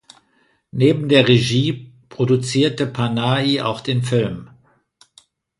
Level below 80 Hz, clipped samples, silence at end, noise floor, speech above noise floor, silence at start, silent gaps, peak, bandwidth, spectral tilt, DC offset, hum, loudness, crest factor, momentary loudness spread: -54 dBFS; under 0.1%; 1.15 s; -61 dBFS; 44 dB; 0.75 s; none; 0 dBFS; 11.5 kHz; -6 dB/octave; under 0.1%; none; -18 LUFS; 18 dB; 13 LU